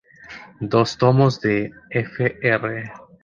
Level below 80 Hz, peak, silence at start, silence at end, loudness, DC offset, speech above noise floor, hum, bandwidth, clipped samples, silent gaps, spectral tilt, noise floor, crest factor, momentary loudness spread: -54 dBFS; -2 dBFS; 0.25 s; 0.25 s; -20 LUFS; under 0.1%; 22 dB; none; 7.4 kHz; under 0.1%; none; -7 dB/octave; -42 dBFS; 18 dB; 20 LU